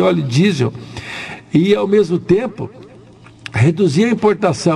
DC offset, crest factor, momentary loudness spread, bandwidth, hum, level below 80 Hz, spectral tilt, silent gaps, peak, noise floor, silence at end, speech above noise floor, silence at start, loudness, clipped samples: under 0.1%; 14 dB; 15 LU; 12 kHz; none; -48 dBFS; -6.5 dB/octave; none; -2 dBFS; -41 dBFS; 0 s; 27 dB; 0 s; -15 LUFS; under 0.1%